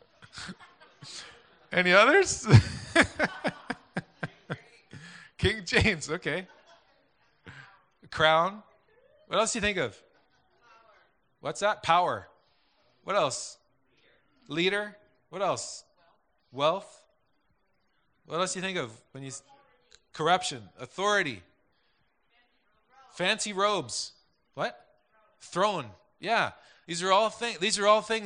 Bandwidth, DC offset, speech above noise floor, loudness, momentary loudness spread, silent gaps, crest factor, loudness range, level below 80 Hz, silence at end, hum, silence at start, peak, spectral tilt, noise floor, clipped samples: 10 kHz; under 0.1%; 47 dB; -27 LUFS; 21 LU; none; 26 dB; 10 LU; -54 dBFS; 0 s; none; 0.35 s; -4 dBFS; -4 dB/octave; -74 dBFS; under 0.1%